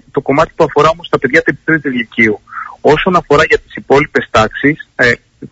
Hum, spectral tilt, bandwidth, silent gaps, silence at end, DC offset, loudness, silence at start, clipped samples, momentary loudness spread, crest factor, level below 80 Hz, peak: none; -5.5 dB/octave; 8 kHz; none; 0.05 s; under 0.1%; -12 LUFS; 0.15 s; under 0.1%; 5 LU; 12 dB; -38 dBFS; 0 dBFS